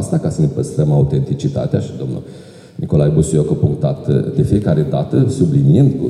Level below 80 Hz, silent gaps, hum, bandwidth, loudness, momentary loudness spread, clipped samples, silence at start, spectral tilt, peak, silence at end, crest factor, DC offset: -40 dBFS; none; none; 10.5 kHz; -15 LUFS; 11 LU; under 0.1%; 0 s; -8.5 dB/octave; -2 dBFS; 0 s; 14 dB; under 0.1%